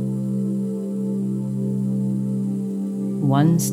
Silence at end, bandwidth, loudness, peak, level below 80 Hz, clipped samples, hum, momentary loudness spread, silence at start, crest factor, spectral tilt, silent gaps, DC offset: 0 s; 15 kHz; -23 LUFS; -6 dBFS; -72 dBFS; under 0.1%; none; 8 LU; 0 s; 16 dB; -7.5 dB/octave; none; under 0.1%